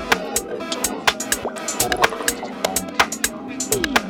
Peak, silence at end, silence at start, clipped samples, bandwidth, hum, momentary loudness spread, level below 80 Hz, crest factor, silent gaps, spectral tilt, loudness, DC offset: 0 dBFS; 0 s; 0 s; under 0.1%; 18 kHz; none; 6 LU; -46 dBFS; 22 dB; none; -1.5 dB/octave; -21 LUFS; under 0.1%